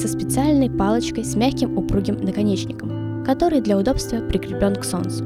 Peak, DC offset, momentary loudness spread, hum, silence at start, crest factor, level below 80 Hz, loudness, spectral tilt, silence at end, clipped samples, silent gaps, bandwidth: -6 dBFS; under 0.1%; 6 LU; none; 0 s; 14 dB; -36 dBFS; -21 LUFS; -6 dB/octave; 0 s; under 0.1%; none; 15.5 kHz